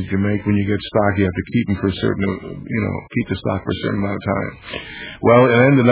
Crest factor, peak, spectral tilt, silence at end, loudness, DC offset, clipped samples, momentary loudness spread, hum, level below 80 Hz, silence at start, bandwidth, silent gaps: 16 dB; 0 dBFS; -11 dB/octave; 0 s; -18 LUFS; under 0.1%; under 0.1%; 14 LU; none; -38 dBFS; 0 s; 4 kHz; none